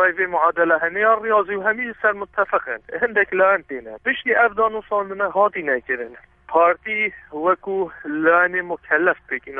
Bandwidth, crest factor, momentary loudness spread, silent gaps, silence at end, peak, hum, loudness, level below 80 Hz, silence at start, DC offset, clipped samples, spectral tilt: 3.8 kHz; 16 dB; 9 LU; none; 0 s; -4 dBFS; none; -20 LUFS; -58 dBFS; 0 s; under 0.1%; under 0.1%; -8 dB/octave